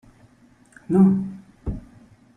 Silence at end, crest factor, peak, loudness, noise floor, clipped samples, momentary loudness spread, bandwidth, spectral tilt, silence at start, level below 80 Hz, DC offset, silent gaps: 0.55 s; 18 dB; -6 dBFS; -21 LUFS; -55 dBFS; under 0.1%; 18 LU; 2.5 kHz; -11 dB/octave; 0.9 s; -44 dBFS; under 0.1%; none